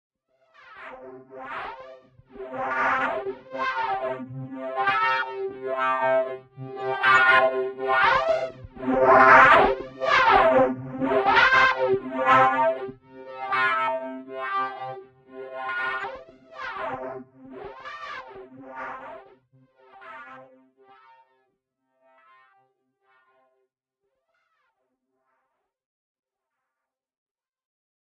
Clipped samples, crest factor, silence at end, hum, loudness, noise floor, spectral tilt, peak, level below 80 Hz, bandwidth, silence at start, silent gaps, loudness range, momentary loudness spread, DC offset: under 0.1%; 24 dB; 7.75 s; none; -21 LUFS; -87 dBFS; -5 dB/octave; -2 dBFS; -56 dBFS; 10 kHz; 0.7 s; none; 20 LU; 24 LU; under 0.1%